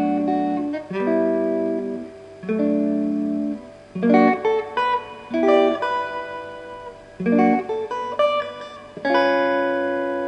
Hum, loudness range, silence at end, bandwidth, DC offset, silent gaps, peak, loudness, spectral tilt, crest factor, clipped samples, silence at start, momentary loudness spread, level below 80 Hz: none; 3 LU; 0 s; 9 kHz; under 0.1%; none; -2 dBFS; -21 LUFS; -7 dB/octave; 18 dB; under 0.1%; 0 s; 17 LU; -60 dBFS